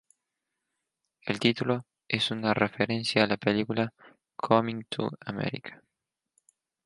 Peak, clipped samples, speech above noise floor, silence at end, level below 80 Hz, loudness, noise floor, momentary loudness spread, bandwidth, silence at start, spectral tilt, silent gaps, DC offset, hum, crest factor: -6 dBFS; under 0.1%; 58 dB; 1.1 s; -68 dBFS; -28 LUFS; -86 dBFS; 11 LU; 11.5 kHz; 1.25 s; -5.5 dB/octave; none; under 0.1%; none; 24 dB